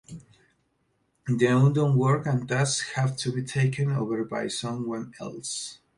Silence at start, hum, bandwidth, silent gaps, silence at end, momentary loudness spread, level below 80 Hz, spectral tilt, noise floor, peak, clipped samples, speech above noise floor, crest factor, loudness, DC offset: 0.1 s; none; 11.5 kHz; none; 0.2 s; 14 LU; -62 dBFS; -5.5 dB/octave; -72 dBFS; -8 dBFS; under 0.1%; 46 dB; 18 dB; -26 LUFS; under 0.1%